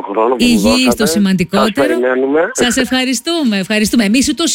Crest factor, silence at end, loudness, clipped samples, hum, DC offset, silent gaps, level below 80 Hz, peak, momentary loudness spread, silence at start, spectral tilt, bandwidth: 10 dB; 0 s; -12 LUFS; under 0.1%; none; under 0.1%; none; -40 dBFS; -2 dBFS; 4 LU; 0 s; -4 dB/octave; 17 kHz